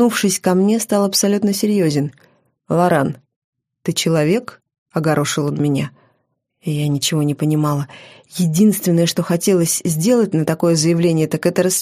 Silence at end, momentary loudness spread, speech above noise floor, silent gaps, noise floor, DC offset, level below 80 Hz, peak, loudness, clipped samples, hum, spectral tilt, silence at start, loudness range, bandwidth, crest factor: 0 s; 9 LU; 52 dB; 3.36-3.53 s, 4.78-4.86 s; -68 dBFS; under 0.1%; -60 dBFS; -2 dBFS; -17 LUFS; under 0.1%; none; -5 dB/octave; 0 s; 4 LU; 15.5 kHz; 14 dB